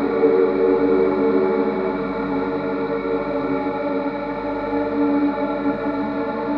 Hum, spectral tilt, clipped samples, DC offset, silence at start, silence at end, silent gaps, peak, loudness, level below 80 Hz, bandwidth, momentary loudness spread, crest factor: 50 Hz at -40 dBFS; -9 dB/octave; under 0.1%; under 0.1%; 0 s; 0 s; none; -6 dBFS; -21 LUFS; -48 dBFS; 5.4 kHz; 7 LU; 14 dB